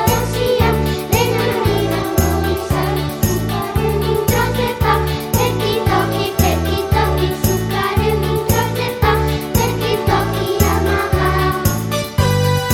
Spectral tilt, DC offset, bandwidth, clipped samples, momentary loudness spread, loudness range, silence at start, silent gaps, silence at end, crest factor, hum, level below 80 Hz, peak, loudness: -5 dB/octave; under 0.1%; 17 kHz; under 0.1%; 3 LU; 1 LU; 0 s; none; 0 s; 16 dB; none; -26 dBFS; 0 dBFS; -17 LUFS